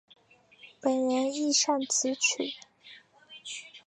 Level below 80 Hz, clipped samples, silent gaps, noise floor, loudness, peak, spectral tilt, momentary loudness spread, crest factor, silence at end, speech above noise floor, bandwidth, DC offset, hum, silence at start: -86 dBFS; under 0.1%; none; -57 dBFS; -27 LUFS; -12 dBFS; -0.5 dB/octave; 17 LU; 18 dB; 0.1 s; 29 dB; 11.5 kHz; under 0.1%; none; 0.65 s